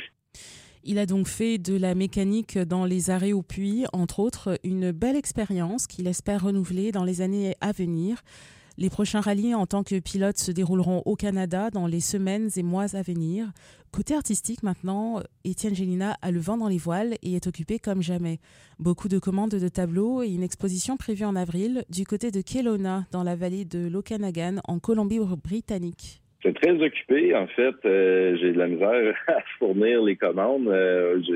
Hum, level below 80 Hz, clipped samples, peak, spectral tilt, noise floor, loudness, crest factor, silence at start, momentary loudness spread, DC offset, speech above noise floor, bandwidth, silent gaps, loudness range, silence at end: none; -52 dBFS; under 0.1%; -8 dBFS; -6 dB/octave; -49 dBFS; -26 LUFS; 16 dB; 0 s; 8 LU; under 0.1%; 24 dB; 15.5 kHz; none; 6 LU; 0 s